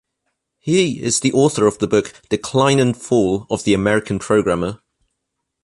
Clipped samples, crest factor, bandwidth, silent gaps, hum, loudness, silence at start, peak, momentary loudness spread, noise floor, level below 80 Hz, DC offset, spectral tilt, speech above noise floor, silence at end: under 0.1%; 16 dB; 11.5 kHz; none; none; -17 LUFS; 0.65 s; -2 dBFS; 7 LU; -77 dBFS; -48 dBFS; under 0.1%; -5 dB/octave; 60 dB; 0.9 s